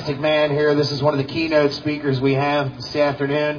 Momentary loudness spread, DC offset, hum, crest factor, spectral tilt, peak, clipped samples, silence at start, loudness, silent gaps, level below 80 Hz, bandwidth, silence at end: 4 LU; under 0.1%; none; 16 dB; -6.5 dB/octave; -2 dBFS; under 0.1%; 0 s; -19 LUFS; none; -52 dBFS; 5.4 kHz; 0 s